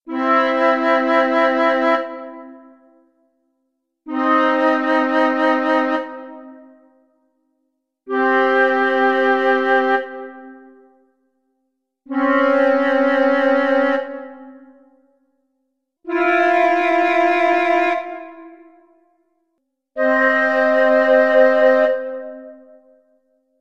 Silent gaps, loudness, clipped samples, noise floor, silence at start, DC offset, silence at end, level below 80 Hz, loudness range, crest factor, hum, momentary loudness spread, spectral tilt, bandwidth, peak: none; -16 LUFS; under 0.1%; -73 dBFS; 0.05 s; under 0.1%; 1.05 s; -70 dBFS; 5 LU; 16 dB; none; 18 LU; -4 dB/octave; 7.4 kHz; -2 dBFS